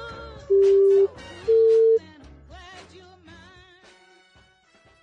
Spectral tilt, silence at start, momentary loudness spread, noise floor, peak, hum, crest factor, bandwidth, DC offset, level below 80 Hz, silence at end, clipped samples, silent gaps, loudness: -6.5 dB/octave; 0 s; 21 LU; -58 dBFS; -12 dBFS; none; 10 dB; 7.4 kHz; under 0.1%; -54 dBFS; 3.05 s; under 0.1%; none; -19 LUFS